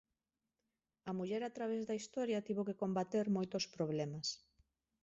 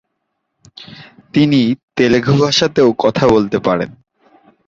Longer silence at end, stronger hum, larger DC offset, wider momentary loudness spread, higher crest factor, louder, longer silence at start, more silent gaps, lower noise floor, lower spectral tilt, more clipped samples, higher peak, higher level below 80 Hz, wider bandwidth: about the same, 0.65 s vs 0.75 s; neither; neither; about the same, 6 LU vs 8 LU; about the same, 16 dB vs 14 dB; second, -40 LUFS vs -13 LUFS; first, 1.05 s vs 0.8 s; second, none vs 1.83-1.88 s; first, under -90 dBFS vs -72 dBFS; about the same, -5.5 dB/octave vs -6 dB/octave; neither; second, -26 dBFS vs 0 dBFS; second, -78 dBFS vs -46 dBFS; about the same, 8 kHz vs 7.8 kHz